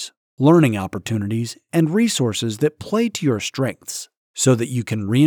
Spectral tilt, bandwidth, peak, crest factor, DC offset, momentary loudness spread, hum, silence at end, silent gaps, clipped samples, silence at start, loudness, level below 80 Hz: -5.5 dB/octave; 19.5 kHz; -4 dBFS; 16 dB; under 0.1%; 11 LU; none; 0 s; 0.17-0.37 s, 4.17-4.34 s; under 0.1%; 0 s; -20 LUFS; -60 dBFS